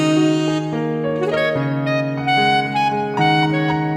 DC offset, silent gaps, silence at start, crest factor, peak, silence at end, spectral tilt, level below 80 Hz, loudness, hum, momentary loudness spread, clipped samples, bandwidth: under 0.1%; none; 0 s; 12 dB; -4 dBFS; 0 s; -6 dB/octave; -54 dBFS; -18 LUFS; none; 5 LU; under 0.1%; 10.5 kHz